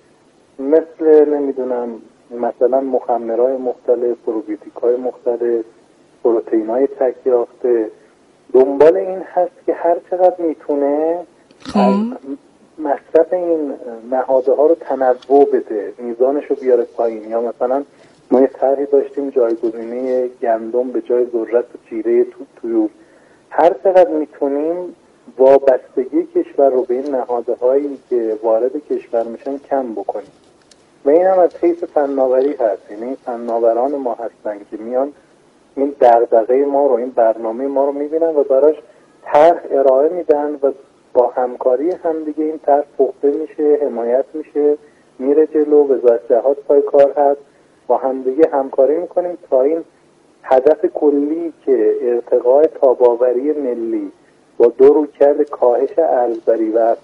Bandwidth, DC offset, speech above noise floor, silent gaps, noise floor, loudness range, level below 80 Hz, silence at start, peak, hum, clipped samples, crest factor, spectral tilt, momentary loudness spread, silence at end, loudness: 6.4 kHz; under 0.1%; 36 dB; none; -51 dBFS; 4 LU; -64 dBFS; 0.6 s; 0 dBFS; none; under 0.1%; 16 dB; -8 dB/octave; 11 LU; 0.05 s; -16 LUFS